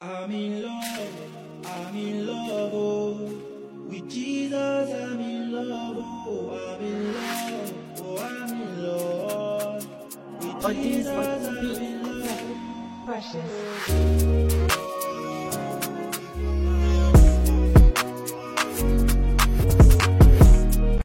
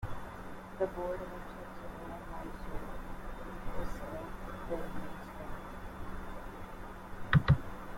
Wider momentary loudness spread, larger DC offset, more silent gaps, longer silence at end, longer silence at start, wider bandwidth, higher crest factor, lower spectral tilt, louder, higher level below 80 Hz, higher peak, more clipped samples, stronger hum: about the same, 18 LU vs 16 LU; neither; neither; about the same, 0 s vs 0 s; about the same, 0 s vs 0 s; about the same, 16.5 kHz vs 16.5 kHz; second, 16 dB vs 24 dB; second, -6 dB/octave vs -7.5 dB/octave; first, -24 LUFS vs -39 LUFS; first, -24 dBFS vs -46 dBFS; first, -6 dBFS vs -12 dBFS; neither; neither